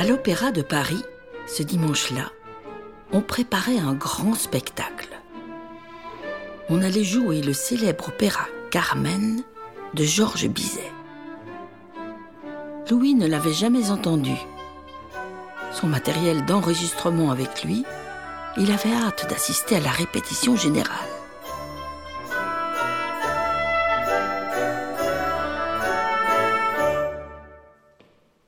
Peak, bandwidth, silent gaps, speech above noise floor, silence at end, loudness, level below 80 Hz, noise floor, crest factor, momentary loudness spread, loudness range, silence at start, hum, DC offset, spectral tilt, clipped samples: -6 dBFS; 19 kHz; none; 35 dB; 0.8 s; -23 LUFS; -52 dBFS; -58 dBFS; 18 dB; 18 LU; 3 LU; 0 s; none; 0.2%; -4.5 dB/octave; under 0.1%